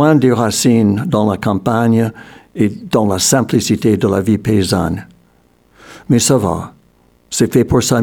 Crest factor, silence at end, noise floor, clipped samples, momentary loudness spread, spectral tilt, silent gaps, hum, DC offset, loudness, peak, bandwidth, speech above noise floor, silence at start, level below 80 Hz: 14 dB; 0 s; -53 dBFS; under 0.1%; 9 LU; -5 dB/octave; none; none; 0.1%; -14 LUFS; 0 dBFS; 20 kHz; 40 dB; 0 s; -42 dBFS